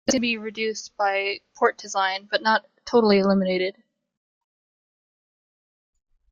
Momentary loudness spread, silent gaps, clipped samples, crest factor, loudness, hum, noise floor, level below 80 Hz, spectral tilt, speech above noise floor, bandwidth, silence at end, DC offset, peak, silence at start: 9 LU; none; under 0.1%; 18 dB; -23 LUFS; none; under -90 dBFS; -62 dBFS; -4 dB/octave; over 67 dB; 7.6 kHz; 2.6 s; under 0.1%; -6 dBFS; 0.05 s